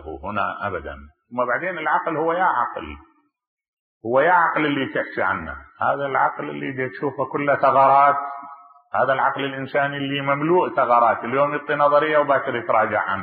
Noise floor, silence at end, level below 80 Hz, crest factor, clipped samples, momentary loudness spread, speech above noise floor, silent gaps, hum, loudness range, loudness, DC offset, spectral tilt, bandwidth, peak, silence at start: -43 dBFS; 0 s; -52 dBFS; 16 dB; under 0.1%; 12 LU; 22 dB; 3.47-3.57 s, 3.68-4.01 s; none; 4 LU; -20 LUFS; under 0.1%; -10 dB/octave; 4.7 kHz; -4 dBFS; 0 s